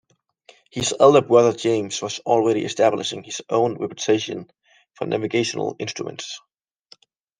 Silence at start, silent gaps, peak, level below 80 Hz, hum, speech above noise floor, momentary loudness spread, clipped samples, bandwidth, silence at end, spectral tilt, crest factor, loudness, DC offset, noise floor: 0.75 s; none; -2 dBFS; -62 dBFS; none; 34 dB; 17 LU; under 0.1%; 10 kHz; 1 s; -4.5 dB/octave; 20 dB; -21 LUFS; under 0.1%; -54 dBFS